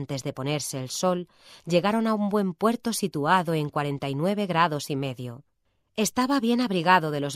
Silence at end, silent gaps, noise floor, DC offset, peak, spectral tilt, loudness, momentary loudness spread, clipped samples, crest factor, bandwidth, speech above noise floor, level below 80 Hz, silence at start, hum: 0 s; none; -60 dBFS; under 0.1%; -6 dBFS; -5 dB/octave; -25 LUFS; 10 LU; under 0.1%; 20 dB; 16 kHz; 35 dB; -66 dBFS; 0 s; none